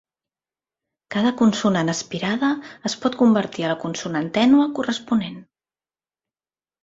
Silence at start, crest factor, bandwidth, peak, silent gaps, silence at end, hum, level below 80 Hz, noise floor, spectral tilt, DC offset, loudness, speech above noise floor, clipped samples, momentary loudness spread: 1.1 s; 16 dB; 7.8 kHz; -6 dBFS; none; 1.4 s; none; -62 dBFS; under -90 dBFS; -5 dB/octave; under 0.1%; -21 LUFS; over 70 dB; under 0.1%; 9 LU